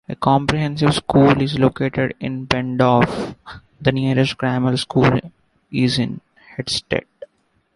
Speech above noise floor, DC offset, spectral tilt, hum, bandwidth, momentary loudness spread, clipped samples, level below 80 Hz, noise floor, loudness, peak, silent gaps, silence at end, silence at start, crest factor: 46 dB; under 0.1%; -6.5 dB/octave; none; 11.5 kHz; 12 LU; under 0.1%; -44 dBFS; -63 dBFS; -18 LUFS; 0 dBFS; none; 0.5 s; 0.1 s; 18 dB